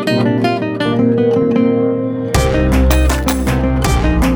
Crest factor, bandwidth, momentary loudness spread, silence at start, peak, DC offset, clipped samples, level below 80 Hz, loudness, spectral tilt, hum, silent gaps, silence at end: 12 dB; over 20 kHz; 4 LU; 0 s; 0 dBFS; under 0.1%; under 0.1%; -18 dBFS; -14 LUFS; -6 dB/octave; none; none; 0 s